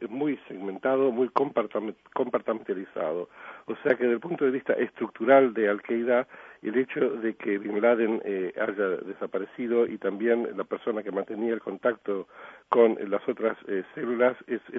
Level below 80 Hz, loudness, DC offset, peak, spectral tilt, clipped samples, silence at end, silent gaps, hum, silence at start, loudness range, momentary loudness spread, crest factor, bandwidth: -78 dBFS; -27 LUFS; under 0.1%; -6 dBFS; -8.5 dB/octave; under 0.1%; 0 s; none; none; 0 s; 4 LU; 11 LU; 20 dB; 5 kHz